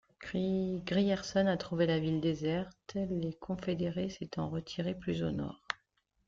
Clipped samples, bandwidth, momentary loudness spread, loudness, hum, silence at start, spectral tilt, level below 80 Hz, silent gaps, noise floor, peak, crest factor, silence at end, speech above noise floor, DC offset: under 0.1%; 7.6 kHz; 9 LU; -35 LUFS; none; 0.2 s; -6.5 dB/octave; -60 dBFS; none; -77 dBFS; -14 dBFS; 20 dB; 0.5 s; 43 dB; under 0.1%